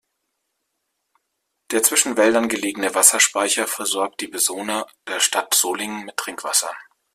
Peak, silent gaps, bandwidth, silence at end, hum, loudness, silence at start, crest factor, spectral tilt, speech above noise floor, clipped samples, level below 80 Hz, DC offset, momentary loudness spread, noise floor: 0 dBFS; none; 16 kHz; 0.3 s; none; -19 LUFS; 1.7 s; 22 dB; 0 dB/octave; 55 dB; under 0.1%; -68 dBFS; under 0.1%; 13 LU; -76 dBFS